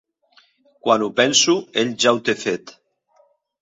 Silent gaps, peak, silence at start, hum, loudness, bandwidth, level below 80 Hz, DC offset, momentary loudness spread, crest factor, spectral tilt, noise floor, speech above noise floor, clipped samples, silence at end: none; 0 dBFS; 0.85 s; none; -18 LUFS; 8 kHz; -66 dBFS; under 0.1%; 11 LU; 20 dB; -2.5 dB/octave; -60 dBFS; 41 dB; under 0.1%; 0.9 s